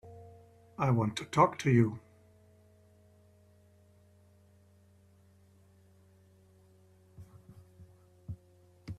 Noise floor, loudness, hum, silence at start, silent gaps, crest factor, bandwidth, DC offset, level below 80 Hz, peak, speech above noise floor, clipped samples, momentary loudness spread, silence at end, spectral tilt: -63 dBFS; -29 LUFS; none; 0.05 s; none; 24 dB; 12 kHz; under 0.1%; -66 dBFS; -12 dBFS; 35 dB; under 0.1%; 28 LU; 0.05 s; -7 dB/octave